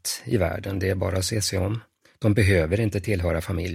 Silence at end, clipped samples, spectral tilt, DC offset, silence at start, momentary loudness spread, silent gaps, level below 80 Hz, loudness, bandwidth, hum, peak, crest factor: 0 s; under 0.1%; -5 dB/octave; under 0.1%; 0.05 s; 7 LU; none; -42 dBFS; -24 LUFS; 16 kHz; none; -6 dBFS; 18 dB